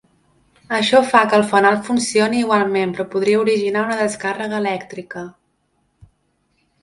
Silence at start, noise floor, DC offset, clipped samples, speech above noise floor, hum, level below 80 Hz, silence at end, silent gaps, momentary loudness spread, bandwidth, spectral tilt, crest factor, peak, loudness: 0.7 s; -66 dBFS; under 0.1%; under 0.1%; 49 dB; none; -62 dBFS; 1.55 s; none; 14 LU; 11.5 kHz; -4 dB/octave; 18 dB; 0 dBFS; -17 LUFS